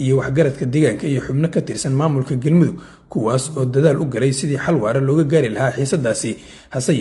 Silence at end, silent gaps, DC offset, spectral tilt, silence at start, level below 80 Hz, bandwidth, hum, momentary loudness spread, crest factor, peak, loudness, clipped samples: 0 s; none; under 0.1%; -6.5 dB/octave; 0 s; -48 dBFS; 11.5 kHz; none; 7 LU; 16 dB; -2 dBFS; -18 LUFS; under 0.1%